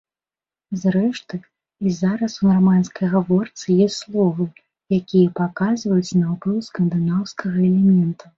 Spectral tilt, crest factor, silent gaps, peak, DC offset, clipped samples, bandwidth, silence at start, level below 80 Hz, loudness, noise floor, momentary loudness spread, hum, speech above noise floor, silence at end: -7.5 dB/octave; 14 dB; none; -4 dBFS; under 0.1%; under 0.1%; 7.6 kHz; 0.7 s; -58 dBFS; -19 LUFS; under -90 dBFS; 8 LU; none; over 72 dB; 0.25 s